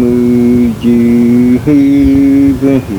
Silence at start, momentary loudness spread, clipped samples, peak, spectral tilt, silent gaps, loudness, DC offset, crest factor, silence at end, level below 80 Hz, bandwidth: 0 s; 2 LU; 0.3%; 0 dBFS; -8.5 dB/octave; none; -8 LUFS; under 0.1%; 8 dB; 0 s; -28 dBFS; 19 kHz